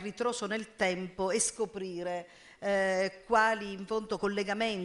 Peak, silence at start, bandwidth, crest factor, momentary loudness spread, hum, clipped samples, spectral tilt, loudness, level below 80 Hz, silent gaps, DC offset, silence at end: -14 dBFS; 0 s; 11.5 kHz; 18 dB; 10 LU; none; under 0.1%; -3 dB/octave; -32 LUFS; -64 dBFS; none; under 0.1%; 0 s